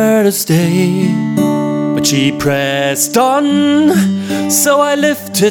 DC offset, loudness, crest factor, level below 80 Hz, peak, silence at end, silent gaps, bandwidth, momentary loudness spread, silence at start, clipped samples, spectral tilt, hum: under 0.1%; -12 LUFS; 10 dB; -50 dBFS; 0 dBFS; 0 s; none; 19.5 kHz; 4 LU; 0 s; under 0.1%; -4.5 dB/octave; none